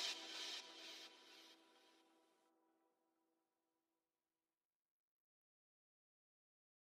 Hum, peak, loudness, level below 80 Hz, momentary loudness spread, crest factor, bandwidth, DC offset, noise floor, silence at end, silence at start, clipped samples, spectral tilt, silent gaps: none; -34 dBFS; -51 LUFS; under -90 dBFS; 17 LU; 26 dB; 14.5 kHz; under 0.1%; under -90 dBFS; 4.6 s; 0 s; under 0.1%; 2 dB/octave; none